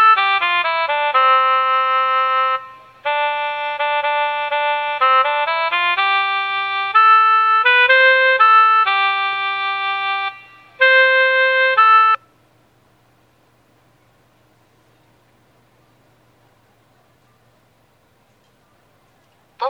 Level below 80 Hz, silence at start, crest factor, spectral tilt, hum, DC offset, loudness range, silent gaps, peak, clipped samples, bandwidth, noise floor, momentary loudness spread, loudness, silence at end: -72 dBFS; 0 s; 16 dB; -2 dB/octave; none; under 0.1%; 6 LU; none; 0 dBFS; under 0.1%; 5.8 kHz; -57 dBFS; 9 LU; -14 LUFS; 0 s